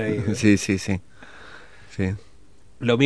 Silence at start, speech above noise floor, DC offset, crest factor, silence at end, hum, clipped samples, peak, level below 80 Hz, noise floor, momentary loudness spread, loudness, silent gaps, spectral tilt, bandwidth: 0 s; 32 dB; 0.5%; 20 dB; 0 s; none; under 0.1%; -2 dBFS; -52 dBFS; -54 dBFS; 25 LU; -23 LUFS; none; -5.5 dB/octave; 11 kHz